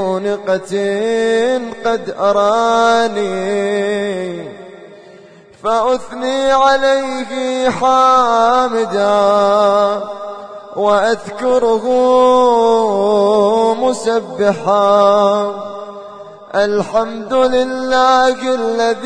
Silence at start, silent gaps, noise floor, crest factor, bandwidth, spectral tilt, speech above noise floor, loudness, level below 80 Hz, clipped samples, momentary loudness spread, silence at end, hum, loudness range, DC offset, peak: 0 s; none; -41 dBFS; 14 dB; 10 kHz; -4.5 dB/octave; 28 dB; -14 LUFS; -50 dBFS; under 0.1%; 11 LU; 0 s; none; 4 LU; under 0.1%; 0 dBFS